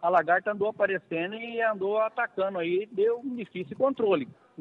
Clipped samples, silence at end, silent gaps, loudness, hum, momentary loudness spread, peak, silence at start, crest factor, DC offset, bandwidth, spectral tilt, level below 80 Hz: under 0.1%; 0.3 s; none; -28 LUFS; none; 8 LU; -10 dBFS; 0 s; 18 dB; under 0.1%; 4.7 kHz; -8 dB/octave; -76 dBFS